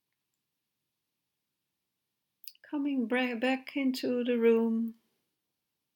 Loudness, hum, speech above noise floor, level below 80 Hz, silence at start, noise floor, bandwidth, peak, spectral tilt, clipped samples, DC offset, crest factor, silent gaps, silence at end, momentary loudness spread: -30 LUFS; none; 56 dB; under -90 dBFS; 2.45 s; -85 dBFS; 19 kHz; -16 dBFS; -5.5 dB/octave; under 0.1%; under 0.1%; 18 dB; none; 1.05 s; 16 LU